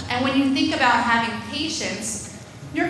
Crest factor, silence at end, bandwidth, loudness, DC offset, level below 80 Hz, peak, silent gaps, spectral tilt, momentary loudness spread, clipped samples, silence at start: 18 dB; 0 s; 11 kHz; -21 LUFS; under 0.1%; -52 dBFS; -4 dBFS; none; -3 dB/octave; 13 LU; under 0.1%; 0 s